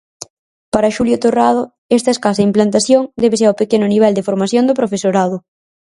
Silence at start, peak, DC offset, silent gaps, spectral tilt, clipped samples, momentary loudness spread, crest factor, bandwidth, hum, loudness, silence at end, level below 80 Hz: 0.2 s; 0 dBFS; under 0.1%; 0.30-0.72 s, 1.78-1.89 s; -5.5 dB/octave; under 0.1%; 7 LU; 14 dB; 11.5 kHz; none; -14 LUFS; 0.55 s; -52 dBFS